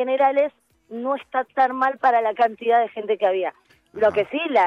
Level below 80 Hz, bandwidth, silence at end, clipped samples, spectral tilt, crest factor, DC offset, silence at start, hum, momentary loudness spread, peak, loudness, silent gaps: -66 dBFS; 7 kHz; 0 s; under 0.1%; -5.5 dB/octave; 14 dB; under 0.1%; 0 s; none; 8 LU; -6 dBFS; -21 LUFS; none